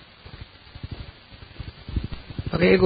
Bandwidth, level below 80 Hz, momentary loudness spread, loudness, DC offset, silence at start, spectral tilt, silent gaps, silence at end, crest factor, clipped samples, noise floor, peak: 5 kHz; -38 dBFS; 21 LU; -29 LUFS; under 0.1%; 0.25 s; -11 dB/octave; none; 0 s; 22 dB; under 0.1%; -45 dBFS; -4 dBFS